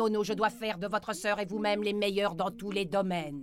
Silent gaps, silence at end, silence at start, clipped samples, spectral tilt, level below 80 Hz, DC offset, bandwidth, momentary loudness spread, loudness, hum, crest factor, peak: none; 0 s; 0 s; under 0.1%; -5 dB/octave; -62 dBFS; under 0.1%; 16 kHz; 4 LU; -31 LUFS; none; 16 dB; -14 dBFS